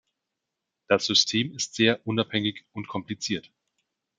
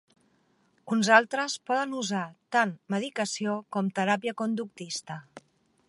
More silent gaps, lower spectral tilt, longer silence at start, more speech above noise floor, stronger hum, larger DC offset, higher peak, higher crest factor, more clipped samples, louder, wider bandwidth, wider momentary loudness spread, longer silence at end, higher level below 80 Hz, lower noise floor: neither; about the same, -3.5 dB/octave vs -4 dB/octave; about the same, 0.9 s vs 0.85 s; first, 58 dB vs 40 dB; neither; neither; about the same, -6 dBFS vs -6 dBFS; about the same, 22 dB vs 24 dB; neither; first, -25 LUFS vs -28 LUFS; second, 9.4 kHz vs 11.5 kHz; about the same, 13 LU vs 14 LU; first, 0.8 s vs 0.5 s; first, -70 dBFS vs -82 dBFS; first, -85 dBFS vs -68 dBFS